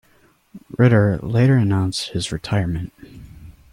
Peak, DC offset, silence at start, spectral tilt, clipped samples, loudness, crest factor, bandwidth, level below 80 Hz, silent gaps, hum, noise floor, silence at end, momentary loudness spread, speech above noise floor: -4 dBFS; under 0.1%; 0.55 s; -6.5 dB/octave; under 0.1%; -19 LUFS; 16 dB; 12 kHz; -44 dBFS; none; none; -57 dBFS; 0.2 s; 13 LU; 39 dB